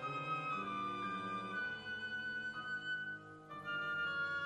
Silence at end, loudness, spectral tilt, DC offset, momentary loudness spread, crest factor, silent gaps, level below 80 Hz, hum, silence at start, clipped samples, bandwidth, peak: 0 s; -41 LUFS; -4.5 dB/octave; under 0.1%; 5 LU; 12 dB; none; -76 dBFS; none; 0 s; under 0.1%; 11.5 kHz; -30 dBFS